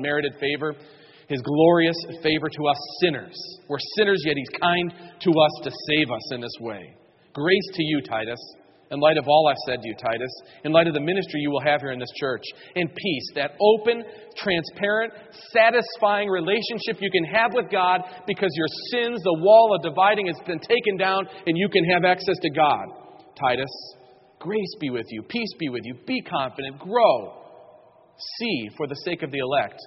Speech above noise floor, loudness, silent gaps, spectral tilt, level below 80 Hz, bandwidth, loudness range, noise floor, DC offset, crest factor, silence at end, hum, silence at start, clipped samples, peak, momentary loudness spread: 30 dB; -23 LUFS; none; -3 dB/octave; -64 dBFS; 6 kHz; 6 LU; -53 dBFS; under 0.1%; 20 dB; 0 s; none; 0 s; under 0.1%; -4 dBFS; 13 LU